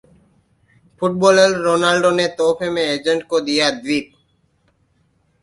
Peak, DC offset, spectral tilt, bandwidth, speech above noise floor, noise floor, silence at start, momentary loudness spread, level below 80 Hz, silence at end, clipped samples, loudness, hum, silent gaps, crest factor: 0 dBFS; under 0.1%; -4 dB/octave; 11.5 kHz; 45 dB; -62 dBFS; 1 s; 9 LU; -58 dBFS; 1.4 s; under 0.1%; -17 LUFS; none; none; 18 dB